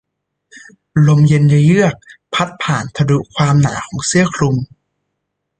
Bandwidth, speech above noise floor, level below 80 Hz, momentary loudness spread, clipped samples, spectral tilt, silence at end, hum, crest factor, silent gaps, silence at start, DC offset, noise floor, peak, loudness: 9.4 kHz; 61 dB; -46 dBFS; 10 LU; under 0.1%; -6 dB/octave; 0.95 s; none; 14 dB; none; 0.55 s; under 0.1%; -74 dBFS; -2 dBFS; -14 LUFS